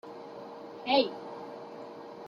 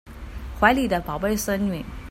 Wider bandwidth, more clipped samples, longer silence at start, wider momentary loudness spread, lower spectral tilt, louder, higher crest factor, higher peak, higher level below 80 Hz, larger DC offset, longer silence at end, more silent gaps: second, 7.2 kHz vs 16 kHz; neither; about the same, 0.05 s vs 0.05 s; about the same, 18 LU vs 18 LU; about the same, -5 dB/octave vs -5 dB/octave; second, -31 LUFS vs -23 LUFS; about the same, 22 dB vs 22 dB; second, -12 dBFS vs -2 dBFS; second, -80 dBFS vs -38 dBFS; neither; about the same, 0 s vs 0 s; neither